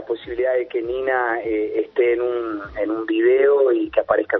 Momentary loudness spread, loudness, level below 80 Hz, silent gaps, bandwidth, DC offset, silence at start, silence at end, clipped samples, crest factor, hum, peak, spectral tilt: 9 LU; -20 LUFS; -52 dBFS; none; 4.2 kHz; under 0.1%; 0 s; 0 s; under 0.1%; 18 dB; none; -2 dBFS; -8.5 dB/octave